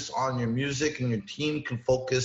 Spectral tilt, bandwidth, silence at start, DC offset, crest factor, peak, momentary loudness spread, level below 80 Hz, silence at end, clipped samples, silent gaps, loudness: -5 dB/octave; 8 kHz; 0 s; under 0.1%; 16 dB; -14 dBFS; 4 LU; -56 dBFS; 0 s; under 0.1%; none; -29 LUFS